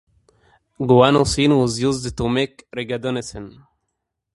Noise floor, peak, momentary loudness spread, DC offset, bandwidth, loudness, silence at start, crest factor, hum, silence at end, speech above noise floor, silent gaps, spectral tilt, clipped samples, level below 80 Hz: -78 dBFS; 0 dBFS; 17 LU; under 0.1%; 11.5 kHz; -19 LUFS; 0.8 s; 20 dB; none; 0.85 s; 59 dB; none; -5.5 dB/octave; under 0.1%; -42 dBFS